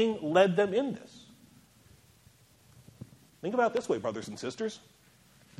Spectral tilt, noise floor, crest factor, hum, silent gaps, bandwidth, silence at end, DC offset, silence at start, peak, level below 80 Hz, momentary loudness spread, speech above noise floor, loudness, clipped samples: -5.5 dB/octave; -61 dBFS; 22 dB; none; none; 14.5 kHz; 0.8 s; under 0.1%; 0 s; -10 dBFS; -72 dBFS; 27 LU; 32 dB; -30 LUFS; under 0.1%